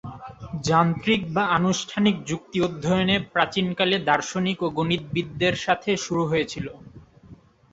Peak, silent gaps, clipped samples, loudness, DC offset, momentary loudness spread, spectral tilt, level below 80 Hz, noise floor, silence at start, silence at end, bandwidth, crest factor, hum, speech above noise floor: -4 dBFS; none; under 0.1%; -23 LUFS; under 0.1%; 9 LU; -5 dB/octave; -52 dBFS; -50 dBFS; 0.05 s; 0.4 s; 8 kHz; 20 dB; none; 26 dB